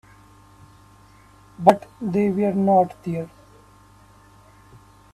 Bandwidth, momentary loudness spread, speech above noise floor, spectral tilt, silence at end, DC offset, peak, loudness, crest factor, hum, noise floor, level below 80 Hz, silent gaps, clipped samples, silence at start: 13.5 kHz; 12 LU; 31 dB; -8 dB/octave; 1.85 s; under 0.1%; 0 dBFS; -21 LUFS; 24 dB; 50 Hz at -45 dBFS; -51 dBFS; -58 dBFS; none; under 0.1%; 1.6 s